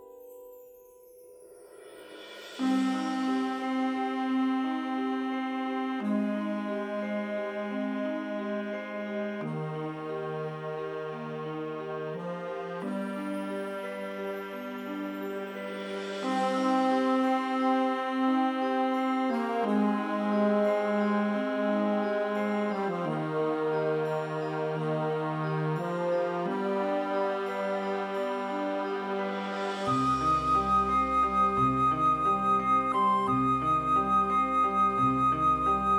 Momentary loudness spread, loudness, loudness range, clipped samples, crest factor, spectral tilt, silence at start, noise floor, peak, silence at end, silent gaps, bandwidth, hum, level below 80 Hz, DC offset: 11 LU; -29 LUFS; 10 LU; under 0.1%; 14 dB; -7 dB/octave; 0 s; -53 dBFS; -16 dBFS; 0 s; none; 14.5 kHz; none; -56 dBFS; under 0.1%